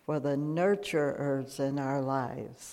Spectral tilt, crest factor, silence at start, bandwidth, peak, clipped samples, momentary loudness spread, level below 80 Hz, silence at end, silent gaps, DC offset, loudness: -6.5 dB/octave; 14 dB; 0.1 s; 15.5 kHz; -16 dBFS; under 0.1%; 5 LU; -68 dBFS; 0 s; none; under 0.1%; -31 LUFS